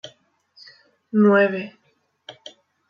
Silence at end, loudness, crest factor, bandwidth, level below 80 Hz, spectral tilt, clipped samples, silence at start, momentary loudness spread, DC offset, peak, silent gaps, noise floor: 0.6 s; -19 LUFS; 18 dB; 6.6 kHz; -80 dBFS; -7.5 dB/octave; under 0.1%; 0.05 s; 26 LU; under 0.1%; -6 dBFS; none; -58 dBFS